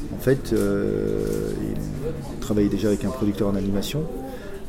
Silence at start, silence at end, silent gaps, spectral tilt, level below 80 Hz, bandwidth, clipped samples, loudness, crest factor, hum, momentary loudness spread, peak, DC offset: 0 s; 0 s; none; -6.5 dB/octave; -36 dBFS; 16.5 kHz; under 0.1%; -25 LUFS; 16 dB; none; 9 LU; -8 dBFS; under 0.1%